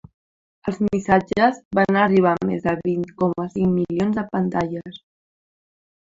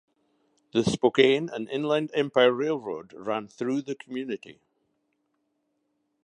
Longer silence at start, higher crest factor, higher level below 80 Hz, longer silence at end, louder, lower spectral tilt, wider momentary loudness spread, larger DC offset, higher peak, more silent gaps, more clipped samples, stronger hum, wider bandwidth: about the same, 0.65 s vs 0.75 s; second, 18 dB vs 24 dB; first, -52 dBFS vs -64 dBFS; second, 1.05 s vs 1.75 s; first, -21 LUFS vs -26 LUFS; first, -7.5 dB/octave vs -5 dB/octave; second, 10 LU vs 14 LU; neither; about the same, -4 dBFS vs -4 dBFS; first, 1.65-1.71 s vs none; neither; neither; second, 7.6 kHz vs 10.5 kHz